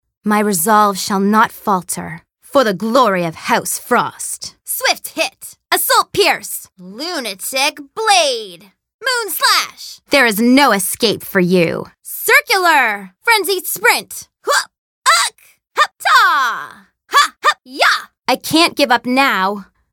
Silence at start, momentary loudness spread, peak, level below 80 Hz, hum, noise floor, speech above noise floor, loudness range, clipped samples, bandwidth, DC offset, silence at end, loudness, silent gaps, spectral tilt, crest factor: 0.25 s; 13 LU; 0 dBFS; -60 dBFS; none; -35 dBFS; 20 dB; 4 LU; under 0.1%; 17.5 kHz; under 0.1%; 0.3 s; -14 LUFS; 8.94-8.99 s, 14.78-15.02 s; -2.5 dB/octave; 16 dB